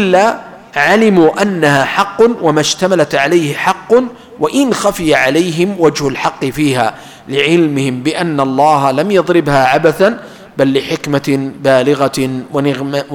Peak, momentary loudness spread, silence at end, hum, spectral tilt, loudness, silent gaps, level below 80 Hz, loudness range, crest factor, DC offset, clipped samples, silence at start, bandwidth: 0 dBFS; 6 LU; 0 s; none; -5 dB/octave; -12 LUFS; none; -46 dBFS; 2 LU; 12 dB; under 0.1%; under 0.1%; 0 s; 19 kHz